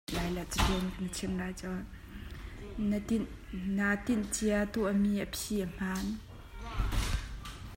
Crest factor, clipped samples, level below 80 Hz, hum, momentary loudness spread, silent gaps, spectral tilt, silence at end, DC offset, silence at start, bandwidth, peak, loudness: 18 dB; under 0.1%; -42 dBFS; none; 15 LU; none; -5 dB/octave; 0 s; under 0.1%; 0.1 s; 16 kHz; -14 dBFS; -34 LUFS